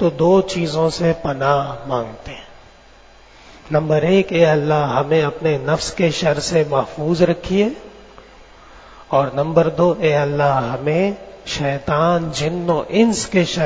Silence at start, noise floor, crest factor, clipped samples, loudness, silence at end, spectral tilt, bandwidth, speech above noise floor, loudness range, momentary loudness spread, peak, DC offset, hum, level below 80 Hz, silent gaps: 0 s; -45 dBFS; 18 dB; under 0.1%; -18 LUFS; 0 s; -6 dB/octave; 8 kHz; 29 dB; 3 LU; 8 LU; 0 dBFS; under 0.1%; none; -44 dBFS; none